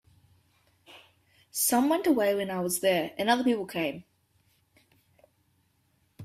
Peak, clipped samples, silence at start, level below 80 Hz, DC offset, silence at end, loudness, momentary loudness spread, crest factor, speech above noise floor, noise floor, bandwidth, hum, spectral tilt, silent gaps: -12 dBFS; under 0.1%; 0.9 s; -72 dBFS; under 0.1%; 0 s; -27 LUFS; 8 LU; 20 dB; 44 dB; -70 dBFS; 16 kHz; none; -3.5 dB/octave; none